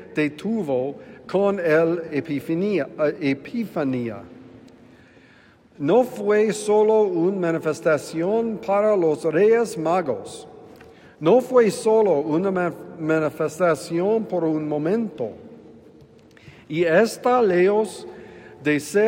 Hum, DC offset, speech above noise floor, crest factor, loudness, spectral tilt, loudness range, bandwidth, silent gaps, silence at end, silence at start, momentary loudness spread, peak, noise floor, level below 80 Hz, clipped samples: none; under 0.1%; 32 dB; 18 dB; -21 LUFS; -6 dB/octave; 5 LU; 16 kHz; none; 0 s; 0 s; 11 LU; -4 dBFS; -52 dBFS; -66 dBFS; under 0.1%